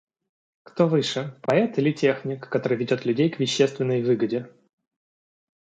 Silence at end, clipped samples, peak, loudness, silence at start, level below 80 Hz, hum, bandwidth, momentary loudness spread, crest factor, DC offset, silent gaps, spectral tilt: 1.3 s; under 0.1%; -6 dBFS; -24 LUFS; 0.75 s; -70 dBFS; none; 9.2 kHz; 7 LU; 18 dB; under 0.1%; none; -6 dB/octave